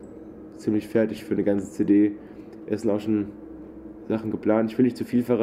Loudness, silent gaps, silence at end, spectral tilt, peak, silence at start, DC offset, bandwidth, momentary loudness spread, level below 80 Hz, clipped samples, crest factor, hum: -25 LUFS; none; 0 s; -8 dB/octave; -8 dBFS; 0 s; under 0.1%; 13 kHz; 21 LU; -58 dBFS; under 0.1%; 16 dB; none